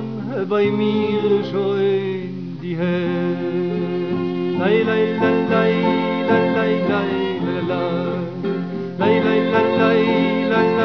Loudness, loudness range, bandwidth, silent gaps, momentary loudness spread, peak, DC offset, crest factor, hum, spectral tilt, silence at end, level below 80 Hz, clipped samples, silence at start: -19 LUFS; 3 LU; 5.4 kHz; none; 8 LU; -4 dBFS; 0.4%; 16 dB; none; -8.5 dB/octave; 0 s; -60 dBFS; under 0.1%; 0 s